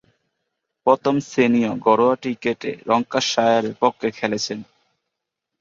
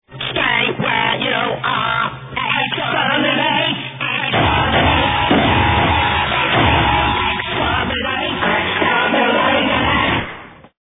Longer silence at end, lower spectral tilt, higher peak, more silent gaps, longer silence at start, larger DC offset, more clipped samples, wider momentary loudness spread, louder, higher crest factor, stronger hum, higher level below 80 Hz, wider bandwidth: first, 0.95 s vs 0.4 s; second, -4.5 dB/octave vs -8 dB/octave; about the same, 0 dBFS vs 0 dBFS; neither; first, 0.85 s vs 0.1 s; neither; neither; about the same, 7 LU vs 5 LU; second, -20 LUFS vs -15 LUFS; about the same, 20 dB vs 16 dB; neither; second, -64 dBFS vs -32 dBFS; first, 7.6 kHz vs 4 kHz